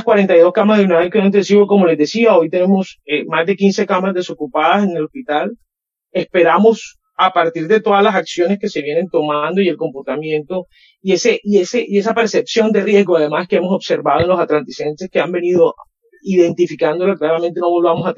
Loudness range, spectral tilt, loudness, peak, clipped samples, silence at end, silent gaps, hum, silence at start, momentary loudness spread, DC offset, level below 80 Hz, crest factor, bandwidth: 4 LU; -6 dB/octave; -14 LUFS; 0 dBFS; under 0.1%; 0.05 s; none; none; 0 s; 9 LU; under 0.1%; -56 dBFS; 14 dB; 7.6 kHz